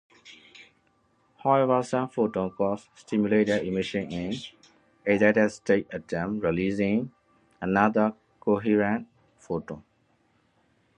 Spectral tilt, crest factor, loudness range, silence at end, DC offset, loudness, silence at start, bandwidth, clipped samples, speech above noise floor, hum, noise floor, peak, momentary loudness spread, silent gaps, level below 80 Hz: -6.5 dB/octave; 22 dB; 2 LU; 1.15 s; under 0.1%; -26 LUFS; 0.25 s; 10 kHz; under 0.1%; 42 dB; none; -67 dBFS; -6 dBFS; 12 LU; none; -58 dBFS